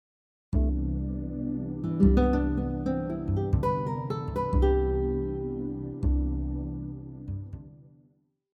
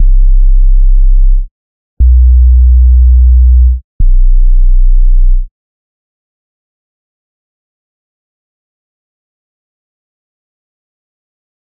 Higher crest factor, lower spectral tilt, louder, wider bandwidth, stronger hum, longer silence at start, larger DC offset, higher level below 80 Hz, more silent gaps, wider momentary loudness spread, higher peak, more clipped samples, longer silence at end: first, 18 dB vs 8 dB; second, -10 dB/octave vs -20 dB/octave; second, -29 LUFS vs -10 LUFS; first, 5 kHz vs 0.3 kHz; neither; first, 0.5 s vs 0 s; neither; second, -32 dBFS vs -8 dBFS; second, none vs 1.51-1.97 s, 3.84-3.99 s; first, 14 LU vs 9 LU; second, -10 dBFS vs 0 dBFS; second, under 0.1% vs 0.2%; second, 0.75 s vs 6.2 s